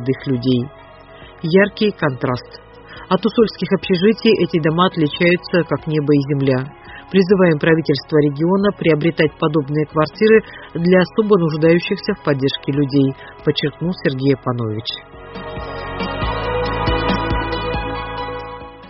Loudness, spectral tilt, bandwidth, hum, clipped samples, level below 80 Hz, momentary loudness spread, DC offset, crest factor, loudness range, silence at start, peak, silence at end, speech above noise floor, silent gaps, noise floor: -17 LUFS; -5.5 dB/octave; 6 kHz; none; under 0.1%; -36 dBFS; 12 LU; under 0.1%; 16 dB; 6 LU; 0 s; -2 dBFS; 0 s; 23 dB; none; -40 dBFS